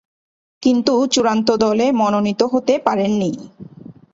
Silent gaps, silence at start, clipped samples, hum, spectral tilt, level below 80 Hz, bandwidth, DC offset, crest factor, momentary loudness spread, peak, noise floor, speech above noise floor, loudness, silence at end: none; 0.6 s; under 0.1%; none; -5 dB/octave; -58 dBFS; 8 kHz; under 0.1%; 16 dB; 5 LU; 0 dBFS; -39 dBFS; 23 dB; -17 LUFS; 0.25 s